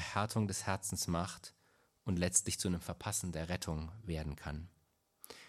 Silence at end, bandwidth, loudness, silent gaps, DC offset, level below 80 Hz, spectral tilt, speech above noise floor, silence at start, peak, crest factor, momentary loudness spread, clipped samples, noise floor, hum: 0 s; 16 kHz; -37 LUFS; none; under 0.1%; -56 dBFS; -4 dB/octave; 38 dB; 0 s; -16 dBFS; 24 dB; 16 LU; under 0.1%; -76 dBFS; none